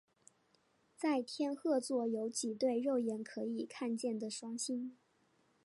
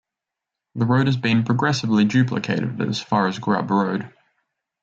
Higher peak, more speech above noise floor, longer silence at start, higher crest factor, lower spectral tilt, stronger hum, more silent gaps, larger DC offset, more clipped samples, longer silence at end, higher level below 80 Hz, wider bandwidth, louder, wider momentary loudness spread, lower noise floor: second, -24 dBFS vs -6 dBFS; second, 37 dB vs 66 dB; first, 1 s vs 0.75 s; about the same, 16 dB vs 16 dB; second, -4 dB/octave vs -6.5 dB/octave; neither; neither; neither; neither; about the same, 0.7 s vs 0.75 s; second, under -90 dBFS vs -62 dBFS; first, 11.5 kHz vs 7.8 kHz; second, -38 LUFS vs -21 LUFS; about the same, 7 LU vs 7 LU; second, -75 dBFS vs -85 dBFS